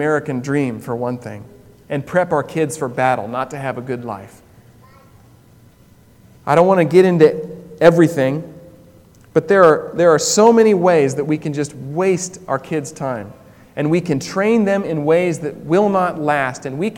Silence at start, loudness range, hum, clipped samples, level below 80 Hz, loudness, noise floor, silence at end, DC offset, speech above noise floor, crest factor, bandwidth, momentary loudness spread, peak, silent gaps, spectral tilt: 0 s; 8 LU; none; under 0.1%; -56 dBFS; -16 LUFS; -48 dBFS; 0 s; under 0.1%; 32 dB; 16 dB; 17.5 kHz; 15 LU; 0 dBFS; none; -5.5 dB/octave